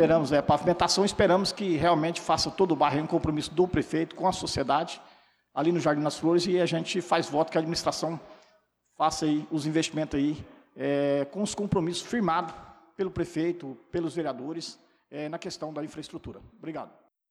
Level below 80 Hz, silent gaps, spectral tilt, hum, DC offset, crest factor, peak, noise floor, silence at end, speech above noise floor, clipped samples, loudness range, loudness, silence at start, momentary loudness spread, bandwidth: -54 dBFS; none; -5 dB/octave; none; under 0.1%; 16 dB; -12 dBFS; -67 dBFS; 0.45 s; 40 dB; under 0.1%; 9 LU; -27 LUFS; 0 s; 15 LU; 13 kHz